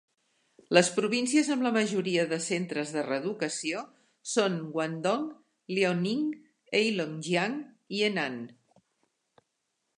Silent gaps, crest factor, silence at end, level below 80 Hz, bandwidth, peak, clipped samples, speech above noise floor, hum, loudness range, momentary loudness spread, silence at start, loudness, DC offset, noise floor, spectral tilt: none; 26 dB; 1.5 s; -80 dBFS; 11.5 kHz; -4 dBFS; under 0.1%; 52 dB; none; 4 LU; 11 LU; 0.7 s; -29 LUFS; under 0.1%; -80 dBFS; -4 dB/octave